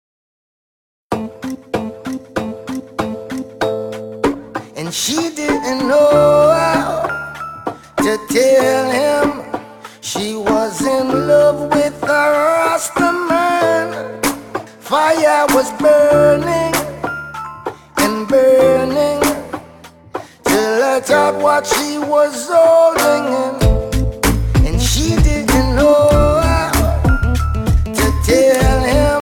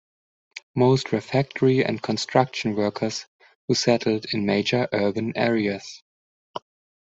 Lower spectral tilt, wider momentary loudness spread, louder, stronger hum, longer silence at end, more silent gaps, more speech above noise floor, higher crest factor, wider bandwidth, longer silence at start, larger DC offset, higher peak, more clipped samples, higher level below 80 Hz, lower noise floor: about the same, -5 dB/octave vs -5.5 dB/octave; second, 15 LU vs 18 LU; first, -14 LUFS vs -23 LUFS; neither; second, 0 s vs 0.5 s; second, none vs 0.63-0.74 s, 3.27-3.39 s, 3.55-3.68 s, 6.02-6.54 s; second, 27 dB vs over 68 dB; second, 14 dB vs 22 dB; first, 19 kHz vs 8 kHz; first, 1.1 s vs 0.55 s; neither; about the same, 0 dBFS vs -2 dBFS; neither; first, -24 dBFS vs -62 dBFS; second, -40 dBFS vs under -90 dBFS